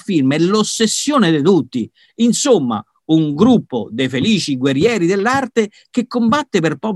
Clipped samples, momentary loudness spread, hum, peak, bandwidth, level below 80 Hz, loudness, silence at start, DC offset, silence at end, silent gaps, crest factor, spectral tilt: under 0.1%; 8 LU; none; 0 dBFS; 12.5 kHz; -56 dBFS; -15 LUFS; 0.1 s; under 0.1%; 0 s; none; 14 dB; -5 dB/octave